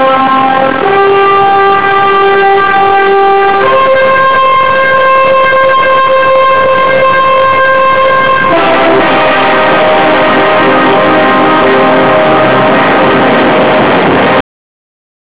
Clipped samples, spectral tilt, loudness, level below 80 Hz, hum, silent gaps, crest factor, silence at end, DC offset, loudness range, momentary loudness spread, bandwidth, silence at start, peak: under 0.1%; -8.5 dB/octave; -6 LUFS; -42 dBFS; none; none; 6 dB; 0.9 s; 6%; 0 LU; 1 LU; 4 kHz; 0 s; 0 dBFS